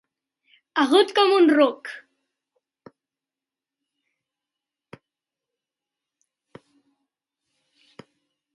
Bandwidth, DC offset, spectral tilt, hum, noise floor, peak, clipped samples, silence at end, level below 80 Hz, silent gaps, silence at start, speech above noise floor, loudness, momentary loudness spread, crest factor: 11.5 kHz; under 0.1%; -3.5 dB/octave; none; -90 dBFS; -4 dBFS; under 0.1%; 6.55 s; -82 dBFS; none; 0.75 s; 72 dB; -19 LUFS; 21 LU; 22 dB